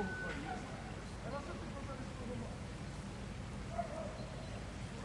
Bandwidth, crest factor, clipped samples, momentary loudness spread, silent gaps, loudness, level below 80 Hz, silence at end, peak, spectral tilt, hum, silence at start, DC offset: 11.5 kHz; 16 dB; under 0.1%; 4 LU; none; -45 LUFS; -52 dBFS; 0 s; -28 dBFS; -5.5 dB/octave; none; 0 s; under 0.1%